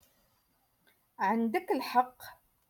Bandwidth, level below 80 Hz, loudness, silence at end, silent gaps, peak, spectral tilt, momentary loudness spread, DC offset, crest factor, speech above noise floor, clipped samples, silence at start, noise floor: 17.5 kHz; -78 dBFS; -31 LUFS; 0.35 s; none; -14 dBFS; -5 dB/octave; 18 LU; under 0.1%; 22 dB; 42 dB; under 0.1%; 1.2 s; -73 dBFS